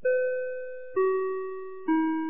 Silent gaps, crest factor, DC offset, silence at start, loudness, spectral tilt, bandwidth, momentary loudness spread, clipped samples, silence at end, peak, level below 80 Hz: none; 12 dB; 0.7%; 0.05 s; -29 LUFS; -9 dB/octave; 3.6 kHz; 9 LU; under 0.1%; 0 s; -14 dBFS; -72 dBFS